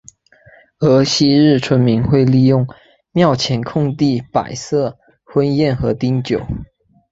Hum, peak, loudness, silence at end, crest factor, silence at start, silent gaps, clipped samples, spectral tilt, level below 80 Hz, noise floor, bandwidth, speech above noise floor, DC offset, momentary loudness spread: none; 0 dBFS; -15 LUFS; 0.5 s; 14 dB; 0.8 s; none; under 0.1%; -6.5 dB/octave; -42 dBFS; -48 dBFS; 8 kHz; 34 dB; under 0.1%; 9 LU